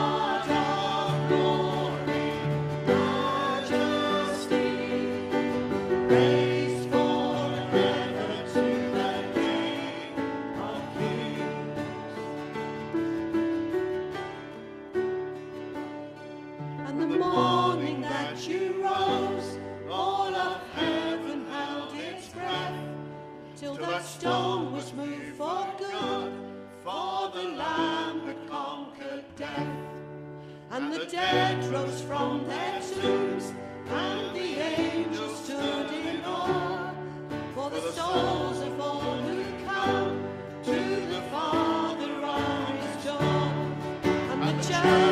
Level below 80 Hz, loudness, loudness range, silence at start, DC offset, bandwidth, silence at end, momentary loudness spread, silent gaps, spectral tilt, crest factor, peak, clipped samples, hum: -62 dBFS; -29 LUFS; 7 LU; 0 s; under 0.1%; 14.5 kHz; 0 s; 12 LU; none; -5.5 dB/octave; 20 dB; -8 dBFS; under 0.1%; none